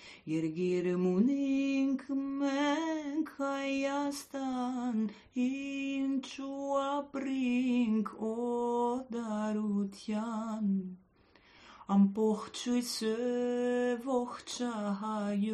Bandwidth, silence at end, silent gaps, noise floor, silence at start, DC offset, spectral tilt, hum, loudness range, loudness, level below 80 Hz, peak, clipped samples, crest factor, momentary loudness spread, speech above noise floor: 13 kHz; 0 s; none; -64 dBFS; 0 s; under 0.1%; -6 dB/octave; none; 3 LU; -33 LUFS; -72 dBFS; -18 dBFS; under 0.1%; 16 dB; 7 LU; 31 dB